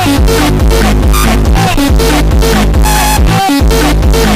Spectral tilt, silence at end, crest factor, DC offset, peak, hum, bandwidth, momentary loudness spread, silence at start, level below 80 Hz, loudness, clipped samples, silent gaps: -5 dB/octave; 0 s; 6 dB; under 0.1%; -2 dBFS; none; 16 kHz; 1 LU; 0 s; -10 dBFS; -9 LUFS; under 0.1%; none